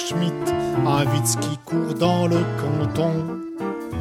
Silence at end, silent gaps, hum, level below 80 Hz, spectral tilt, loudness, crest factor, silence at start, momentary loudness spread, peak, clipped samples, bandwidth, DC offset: 0 s; none; none; -52 dBFS; -5.5 dB/octave; -22 LUFS; 18 dB; 0 s; 9 LU; -4 dBFS; under 0.1%; 16 kHz; under 0.1%